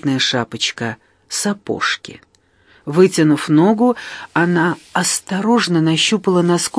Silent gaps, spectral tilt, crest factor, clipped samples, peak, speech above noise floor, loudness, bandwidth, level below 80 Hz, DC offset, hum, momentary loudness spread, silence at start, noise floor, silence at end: none; -4.5 dB/octave; 16 dB; under 0.1%; 0 dBFS; 37 dB; -16 LUFS; 11 kHz; -60 dBFS; under 0.1%; none; 11 LU; 0 s; -53 dBFS; 0 s